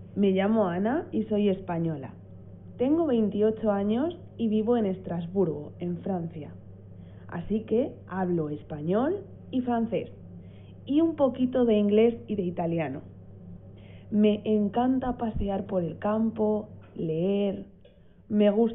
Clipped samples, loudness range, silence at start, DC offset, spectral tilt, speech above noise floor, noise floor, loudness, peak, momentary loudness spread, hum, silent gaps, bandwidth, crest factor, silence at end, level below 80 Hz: under 0.1%; 4 LU; 0 s; under 0.1%; -6.5 dB/octave; 28 dB; -54 dBFS; -27 LUFS; -12 dBFS; 23 LU; none; none; 3.8 kHz; 16 dB; 0 s; -52 dBFS